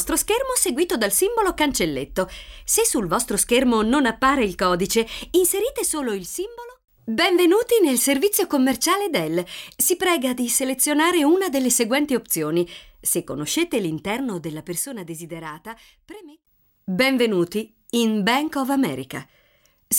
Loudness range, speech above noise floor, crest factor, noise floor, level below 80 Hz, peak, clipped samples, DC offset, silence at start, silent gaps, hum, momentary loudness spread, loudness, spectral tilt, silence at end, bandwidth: 6 LU; 39 dB; 16 dB; -61 dBFS; -48 dBFS; -6 dBFS; under 0.1%; under 0.1%; 0 s; none; none; 12 LU; -21 LUFS; -3 dB/octave; 0 s; 18.5 kHz